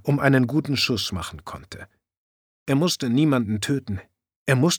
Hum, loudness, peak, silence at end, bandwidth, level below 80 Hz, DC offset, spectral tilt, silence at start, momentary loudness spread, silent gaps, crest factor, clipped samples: none; -22 LUFS; -4 dBFS; 0 s; over 20 kHz; -54 dBFS; under 0.1%; -5 dB/octave; 0.05 s; 19 LU; 2.17-2.66 s, 4.36-4.46 s; 20 dB; under 0.1%